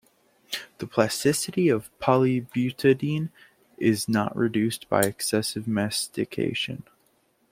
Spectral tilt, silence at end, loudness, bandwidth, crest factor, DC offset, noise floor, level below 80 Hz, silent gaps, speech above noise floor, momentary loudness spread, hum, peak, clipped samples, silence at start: -5 dB/octave; 0.7 s; -25 LUFS; 16.5 kHz; 20 dB; under 0.1%; -66 dBFS; -62 dBFS; none; 42 dB; 9 LU; none; -4 dBFS; under 0.1%; 0.5 s